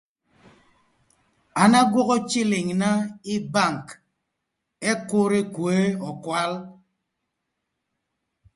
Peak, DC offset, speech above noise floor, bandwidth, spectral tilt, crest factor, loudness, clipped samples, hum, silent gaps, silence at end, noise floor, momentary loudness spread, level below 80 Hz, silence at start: -2 dBFS; under 0.1%; 58 dB; 11.5 kHz; -5 dB/octave; 22 dB; -22 LUFS; under 0.1%; none; none; 1.85 s; -80 dBFS; 12 LU; -66 dBFS; 1.55 s